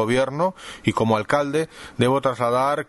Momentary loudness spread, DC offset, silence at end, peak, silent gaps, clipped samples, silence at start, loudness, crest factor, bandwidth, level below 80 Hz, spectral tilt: 6 LU; under 0.1%; 0.05 s; -4 dBFS; none; under 0.1%; 0 s; -22 LUFS; 18 dB; 11.5 kHz; -52 dBFS; -6 dB/octave